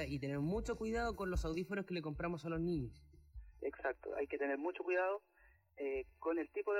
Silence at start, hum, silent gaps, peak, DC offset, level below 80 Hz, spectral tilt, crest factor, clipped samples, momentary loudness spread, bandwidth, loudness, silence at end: 0 s; none; none; -28 dBFS; under 0.1%; -54 dBFS; -7 dB/octave; 14 dB; under 0.1%; 8 LU; 16 kHz; -41 LUFS; 0 s